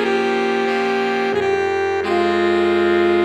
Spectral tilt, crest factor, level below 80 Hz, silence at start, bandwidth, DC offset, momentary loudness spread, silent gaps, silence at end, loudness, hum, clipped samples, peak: -5.5 dB/octave; 14 dB; -54 dBFS; 0 s; 9.6 kHz; under 0.1%; 3 LU; none; 0 s; -18 LUFS; none; under 0.1%; -4 dBFS